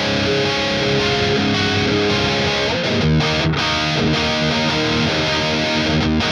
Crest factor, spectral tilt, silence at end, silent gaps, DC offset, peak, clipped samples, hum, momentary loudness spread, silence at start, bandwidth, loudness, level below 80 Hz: 12 dB; -4.5 dB/octave; 0 s; none; under 0.1%; -6 dBFS; under 0.1%; none; 1 LU; 0 s; 11.5 kHz; -17 LUFS; -36 dBFS